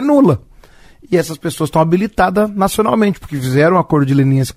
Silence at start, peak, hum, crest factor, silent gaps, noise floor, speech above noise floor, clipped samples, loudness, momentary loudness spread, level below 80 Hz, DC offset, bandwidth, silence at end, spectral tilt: 0 s; 0 dBFS; none; 14 dB; none; -42 dBFS; 29 dB; under 0.1%; -14 LUFS; 7 LU; -40 dBFS; under 0.1%; 15.5 kHz; 0.05 s; -7 dB/octave